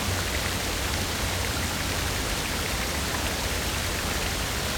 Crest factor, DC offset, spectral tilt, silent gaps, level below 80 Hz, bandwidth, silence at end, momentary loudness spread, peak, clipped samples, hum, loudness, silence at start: 14 dB; under 0.1%; -3 dB/octave; none; -36 dBFS; over 20 kHz; 0 s; 0 LU; -14 dBFS; under 0.1%; none; -27 LUFS; 0 s